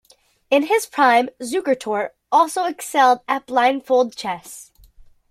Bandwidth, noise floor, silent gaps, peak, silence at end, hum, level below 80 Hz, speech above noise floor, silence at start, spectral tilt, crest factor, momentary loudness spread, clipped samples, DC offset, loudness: 16 kHz; -48 dBFS; none; -2 dBFS; 0.65 s; none; -60 dBFS; 29 dB; 0.5 s; -2.5 dB/octave; 18 dB; 11 LU; under 0.1%; under 0.1%; -19 LUFS